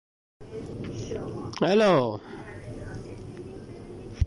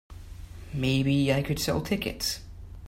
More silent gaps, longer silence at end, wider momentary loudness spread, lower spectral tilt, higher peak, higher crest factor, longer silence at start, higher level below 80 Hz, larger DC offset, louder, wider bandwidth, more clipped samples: neither; about the same, 0 s vs 0 s; about the same, 21 LU vs 21 LU; first, -6.5 dB/octave vs -5 dB/octave; about the same, -12 dBFS vs -12 dBFS; about the same, 18 dB vs 16 dB; first, 0.4 s vs 0.1 s; about the same, -40 dBFS vs -44 dBFS; neither; about the same, -27 LUFS vs -28 LUFS; second, 11.5 kHz vs 16 kHz; neither